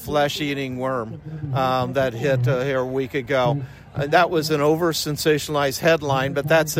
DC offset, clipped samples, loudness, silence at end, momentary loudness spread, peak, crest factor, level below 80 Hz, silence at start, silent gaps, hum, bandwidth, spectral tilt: under 0.1%; under 0.1%; -21 LUFS; 0 s; 8 LU; -4 dBFS; 16 dB; -50 dBFS; 0 s; none; none; 16.5 kHz; -5 dB/octave